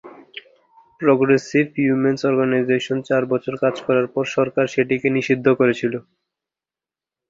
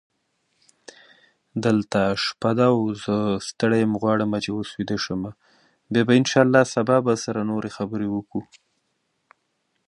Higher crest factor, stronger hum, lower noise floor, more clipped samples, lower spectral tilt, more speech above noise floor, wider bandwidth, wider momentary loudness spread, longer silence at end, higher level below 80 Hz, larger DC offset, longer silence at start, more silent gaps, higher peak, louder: about the same, 18 dB vs 22 dB; neither; first, -90 dBFS vs -73 dBFS; neither; about the same, -6.5 dB/octave vs -5.5 dB/octave; first, 71 dB vs 51 dB; second, 7.8 kHz vs 11 kHz; second, 8 LU vs 11 LU; second, 1.3 s vs 1.45 s; about the same, -62 dBFS vs -58 dBFS; neither; second, 0.05 s vs 1.55 s; neither; about the same, -2 dBFS vs -2 dBFS; first, -19 LUFS vs -22 LUFS